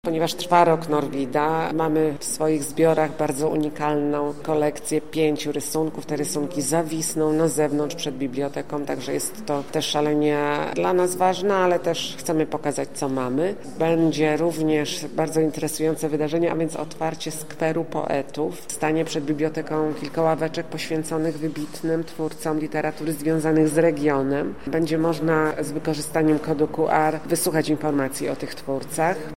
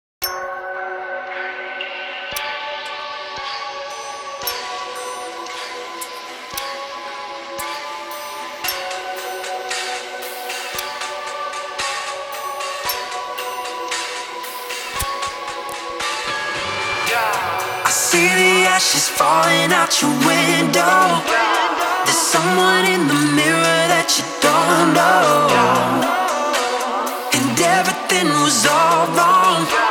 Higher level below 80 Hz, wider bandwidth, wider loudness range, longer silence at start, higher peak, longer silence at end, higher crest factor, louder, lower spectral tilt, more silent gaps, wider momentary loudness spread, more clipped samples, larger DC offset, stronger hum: about the same, -56 dBFS vs -54 dBFS; second, 16 kHz vs over 20 kHz; second, 3 LU vs 13 LU; second, 0.05 s vs 0.2 s; second, -4 dBFS vs 0 dBFS; about the same, 0 s vs 0 s; about the same, 20 dB vs 18 dB; second, -23 LUFS vs -17 LUFS; first, -5 dB/octave vs -2.5 dB/octave; neither; second, 7 LU vs 15 LU; neither; first, 1% vs under 0.1%; neither